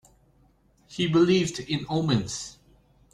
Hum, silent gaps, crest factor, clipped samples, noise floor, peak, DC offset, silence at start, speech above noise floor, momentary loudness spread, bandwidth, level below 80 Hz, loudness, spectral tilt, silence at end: none; none; 18 dB; under 0.1%; -62 dBFS; -10 dBFS; under 0.1%; 0.9 s; 37 dB; 16 LU; 11.5 kHz; -56 dBFS; -25 LUFS; -5.5 dB/octave; 0.65 s